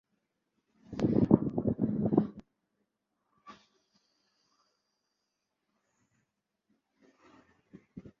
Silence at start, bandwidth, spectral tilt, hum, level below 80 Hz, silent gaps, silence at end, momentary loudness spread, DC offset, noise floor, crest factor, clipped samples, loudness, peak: 0.9 s; 7.2 kHz; -10 dB/octave; none; -58 dBFS; none; 0.1 s; 26 LU; under 0.1%; -84 dBFS; 30 dB; under 0.1%; -30 LUFS; -6 dBFS